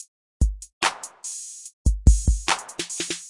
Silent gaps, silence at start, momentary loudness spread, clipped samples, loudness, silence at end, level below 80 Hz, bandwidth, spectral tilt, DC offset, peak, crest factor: 0.08-0.40 s, 0.73-0.81 s, 1.73-1.85 s; 0 s; 13 LU; under 0.1%; -25 LUFS; 0 s; -24 dBFS; 11.5 kHz; -3.5 dB/octave; under 0.1%; -2 dBFS; 22 dB